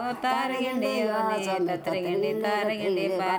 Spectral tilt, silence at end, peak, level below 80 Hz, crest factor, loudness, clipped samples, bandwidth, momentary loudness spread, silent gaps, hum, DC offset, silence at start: -5 dB/octave; 0 s; -12 dBFS; -72 dBFS; 14 dB; -27 LUFS; under 0.1%; over 20 kHz; 2 LU; none; none; under 0.1%; 0 s